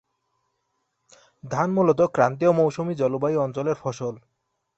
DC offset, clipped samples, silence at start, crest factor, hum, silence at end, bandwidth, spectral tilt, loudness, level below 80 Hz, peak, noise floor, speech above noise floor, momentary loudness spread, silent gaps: under 0.1%; under 0.1%; 1.45 s; 20 dB; none; 0.6 s; 8.2 kHz; -7.5 dB/octave; -23 LUFS; -64 dBFS; -4 dBFS; -75 dBFS; 53 dB; 11 LU; none